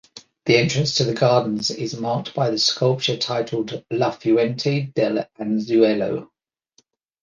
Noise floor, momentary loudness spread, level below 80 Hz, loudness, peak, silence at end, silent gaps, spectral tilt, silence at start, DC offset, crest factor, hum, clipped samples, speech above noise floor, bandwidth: -63 dBFS; 8 LU; -60 dBFS; -21 LUFS; -2 dBFS; 1 s; none; -5 dB/octave; 0.15 s; under 0.1%; 18 dB; none; under 0.1%; 43 dB; 9.8 kHz